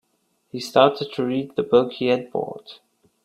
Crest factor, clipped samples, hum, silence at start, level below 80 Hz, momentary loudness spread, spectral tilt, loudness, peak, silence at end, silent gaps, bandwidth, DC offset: 22 dB; under 0.1%; none; 0.55 s; -66 dBFS; 15 LU; -5.5 dB/octave; -21 LUFS; 0 dBFS; 0.5 s; none; 13.5 kHz; under 0.1%